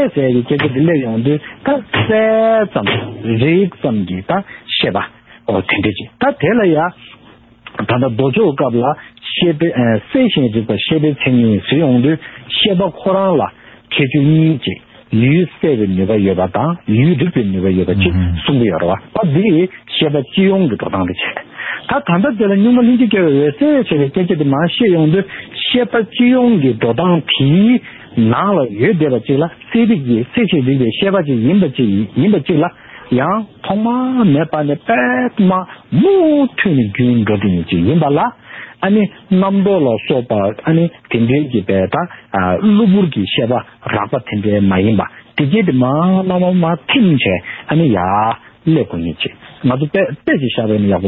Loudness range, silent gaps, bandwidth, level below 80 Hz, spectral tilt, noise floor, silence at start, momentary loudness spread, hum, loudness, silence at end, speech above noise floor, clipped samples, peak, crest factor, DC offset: 3 LU; none; 4.2 kHz; -44 dBFS; -11.5 dB/octave; -44 dBFS; 0 s; 8 LU; none; -14 LUFS; 0 s; 31 dB; under 0.1%; 0 dBFS; 12 dB; under 0.1%